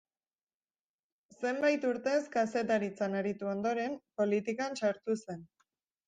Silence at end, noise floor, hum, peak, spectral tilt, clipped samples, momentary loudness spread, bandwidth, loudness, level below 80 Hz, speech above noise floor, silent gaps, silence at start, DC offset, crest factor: 0.65 s; under -90 dBFS; none; -18 dBFS; -5.5 dB/octave; under 0.1%; 7 LU; 9.6 kHz; -33 LUFS; -80 dBFS; over 57 dB; none; 1.4 s; under 0.1%; 16 dB